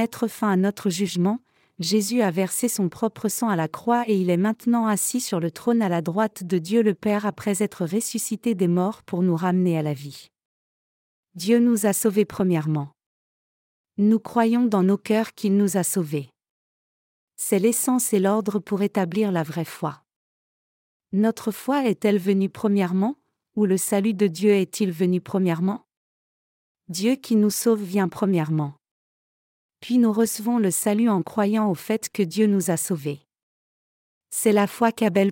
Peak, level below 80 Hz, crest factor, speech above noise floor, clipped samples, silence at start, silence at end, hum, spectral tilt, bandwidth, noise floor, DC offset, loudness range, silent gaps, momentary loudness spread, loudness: -6 dBFS; -70 dBFS; 16 dB; over 68 dB; under 0.1%; 0 s; 0 s; none; -5.5 dB/octave; 17 kHz; under -90 dBFS; under 0.1%; 2 LU; 10.45-11.23 s, 13.06-13.84 s, 16.50-17.28 s, 20.16-21.00 s, 25.97-26.75 s, 28.91-29.69 s, 33.43-34.21 s; 7 LU; -23 LUFS